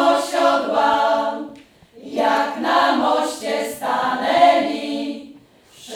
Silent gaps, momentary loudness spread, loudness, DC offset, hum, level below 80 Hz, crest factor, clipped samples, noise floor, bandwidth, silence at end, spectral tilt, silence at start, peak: none; 12 LU; -18 LUFS; under 0.1%; none; -64 dBFS; 18 dB; under 0.1%; -48 dBFS; 17 kHz; 0 s; -3 dB/octave; 0 s; -2 dBFS